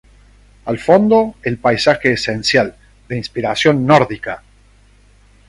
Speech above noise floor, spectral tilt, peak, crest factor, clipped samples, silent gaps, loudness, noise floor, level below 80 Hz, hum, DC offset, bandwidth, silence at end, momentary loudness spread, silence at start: 34 dB; -5.5 dB/octave; 0 dBFS; 16 dB; under 0.1%; none; -15 LUFS; -48 dBFS; -46 dBFS; 50 Hz at -40 dBFS; under 0.1%; 11.5 kHz; 1.1 s; 15 LU; 0.65 s